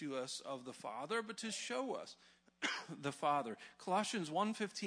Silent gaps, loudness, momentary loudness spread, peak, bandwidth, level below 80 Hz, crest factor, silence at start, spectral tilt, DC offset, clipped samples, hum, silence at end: none; -41 LUFS; 10 LU; -22 dBFS; 11 kHz; -88 dBFS; 20 dB; 0 s; -3.5 dB/octave; under 0.1%; under 0.1%; none; 0 s